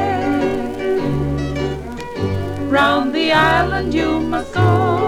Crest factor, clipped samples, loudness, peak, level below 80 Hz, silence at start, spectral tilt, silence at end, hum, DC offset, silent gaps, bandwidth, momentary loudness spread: 16 dB; under 0.1%; -17 LUFS; 0 dBFS; -34 dBFS; 0 s; -6.5 dB/octave; 0 s; none; under 0.1%; none; 15 kHz; 9 LU